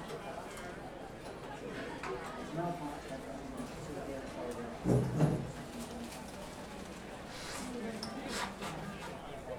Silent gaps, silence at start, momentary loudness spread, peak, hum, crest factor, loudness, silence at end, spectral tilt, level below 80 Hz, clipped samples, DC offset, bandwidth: none; 0 s; 13 LU; -16 dBFS; none; 24 dB; -40 LUFS; 0 s; -5.5 dB/octave; -56 dBFS; under 0.1%; under 0.1%; 18.5 kHz